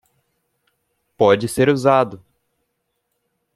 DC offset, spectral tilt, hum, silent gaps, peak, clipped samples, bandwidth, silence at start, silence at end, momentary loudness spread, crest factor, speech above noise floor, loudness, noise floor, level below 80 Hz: under 0.1%; -6 dB/octave; none; none; 0 dBFS; under 0.1%; 13.5 kHz; 1.2 s; 1.4 s; 3 LU; 20 dB; 57 dB; -17 LUFS; -73 dBFS; -56 dBFS